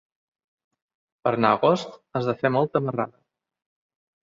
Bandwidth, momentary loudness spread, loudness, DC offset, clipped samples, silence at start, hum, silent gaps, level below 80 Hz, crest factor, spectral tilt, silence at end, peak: 7.6 kHz; 10 LU; -24 LUFS; under 0.1%; under 0.1%; 1.25 s; none; none; -66 dBFS; 24 dB; -7 dB/octave; 1.15 s; -4 dBFS